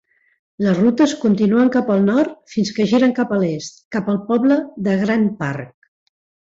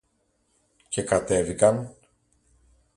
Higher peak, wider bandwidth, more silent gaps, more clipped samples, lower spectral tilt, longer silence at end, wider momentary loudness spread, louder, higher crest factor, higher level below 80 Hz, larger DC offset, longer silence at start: about the same, -4 dBFS vs -6 dBFS; second, 7.8 kHz vs 11.5 kHz; first, 3.85-3.91 s vs none; neither; first, -6.5 dB/octave vs -5 dB/octave; second, 0.9 s vs 1.05 s; about the same, 10 LU vs 11 LU; first, -18 LUFS vs -24 LUFS; second, 14 dB vs 22 dB; second, -58 dBFS vs -52 dBFS; neither; second, 0.6 s vs 0.9 s